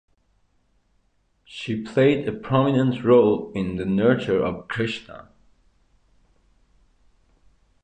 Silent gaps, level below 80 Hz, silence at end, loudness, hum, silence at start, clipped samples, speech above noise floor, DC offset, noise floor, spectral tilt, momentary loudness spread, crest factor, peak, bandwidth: none; -54 dBFS; 2.6 s; -22 LUFS; none; 1.5 s; under 0.1%; 45 dB; under 0.1%; -66 dBFS; -8 dB/octave; 17 LU; 20 dB; -6 dBFS; 9.2 kHz